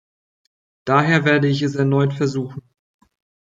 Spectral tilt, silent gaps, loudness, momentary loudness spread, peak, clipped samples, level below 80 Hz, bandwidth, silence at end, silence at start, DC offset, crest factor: -7 dB/octave; none; -18 LUFS; 16 LU; -2 dBFS; under 0.1%; -62 dBFS; 7.6 kHz; 0.9 s; 0.85 s; under 0.1%; 18 dB